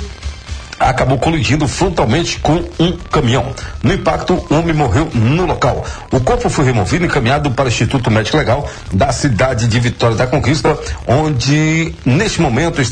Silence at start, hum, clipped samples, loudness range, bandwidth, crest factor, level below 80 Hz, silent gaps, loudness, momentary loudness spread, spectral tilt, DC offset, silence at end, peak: 0 s; none; under 0.1%; 1 LU; 10 kHz; 12 dB; -28 dBFS; none; -14 LUFS; 4 LU; -5.5 dB/octave; under 0.1%; 0 s; -2 dBFS